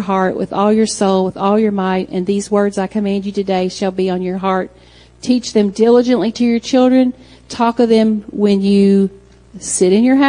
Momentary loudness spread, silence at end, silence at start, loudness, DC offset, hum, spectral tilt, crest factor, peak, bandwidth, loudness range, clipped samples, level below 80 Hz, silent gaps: 7 LU; 0 s; 0 s; -15 LUFS; under 0.1%; none; -5.5 dB/octave; 14 dB; 0 dBFS; 10.5 kHz; 4 LU; under 0.1%; -48 dBFS; none